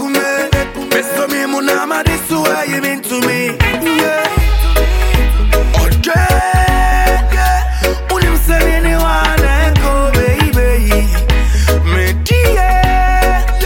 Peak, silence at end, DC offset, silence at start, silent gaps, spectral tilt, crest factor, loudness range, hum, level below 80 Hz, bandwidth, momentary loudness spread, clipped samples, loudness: 0 dBFS; 0 s; under 0.1%; 0 s; none; -5 dB/octave; 10 dB; 2 LU; none; -14 dBFS; 17 kHz; 3 LU; under 0.1%; -13 LUFS